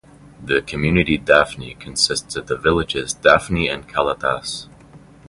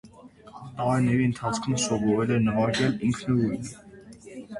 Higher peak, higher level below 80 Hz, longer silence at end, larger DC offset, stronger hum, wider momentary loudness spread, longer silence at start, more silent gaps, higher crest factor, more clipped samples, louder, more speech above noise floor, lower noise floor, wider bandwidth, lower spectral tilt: first, 0 dBFS vs -12 dBFS; first, -38 dBFS vs -54 dBFS; first, 0.3 s vs 0 s; neither; neither; second, 12 LU vs 19 LU; first, 0.4 s vs 0.05 s; neither; first, 20 dB vs 14 dB; neither; first, -18 LUFS vs -25 LUFS; about the same, 26 dB vs 25 dB; second, -45 dBFS vs -49 dBFS; about the same, 11.5 kHz vs 11.5 kHz; second, -4 dB/octave vs -5.5 dB/octave